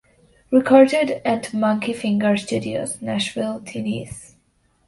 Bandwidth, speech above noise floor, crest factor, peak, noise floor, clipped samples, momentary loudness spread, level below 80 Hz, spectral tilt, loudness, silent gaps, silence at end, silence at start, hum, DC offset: 12 kHz; 43 dB; 20 dB; 0 dBFS; -63 dBFS; under 0.1%; 14 LU; -56 dBFS; -5 dB/octave; -20 LUFS; none; 0.65 s; 0.5 s; none; under 0.1%